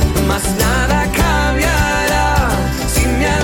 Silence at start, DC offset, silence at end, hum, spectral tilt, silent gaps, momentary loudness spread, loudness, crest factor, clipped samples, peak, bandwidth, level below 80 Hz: 0 s; under 0.1%; 0 s; none; -4.5 dB/octave; none; 2 LU; -15 LUFS; 12 dB; under 0.1%; -2 dBFS; 17 kHz; -20 dBFS